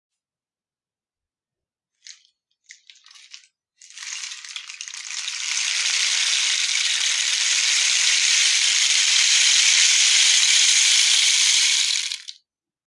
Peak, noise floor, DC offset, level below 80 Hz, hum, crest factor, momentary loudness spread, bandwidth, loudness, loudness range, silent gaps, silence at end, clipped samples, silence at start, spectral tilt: -4 dBFS; under -90 dBFS; under 0.1%; under -90 dBFS; none; 18 dB; 18 LU; 12 kHz; -16 LUFS; 19 LU; none; 0.55 s; under 0.1%; 2.1 s; 10.5 dB/octave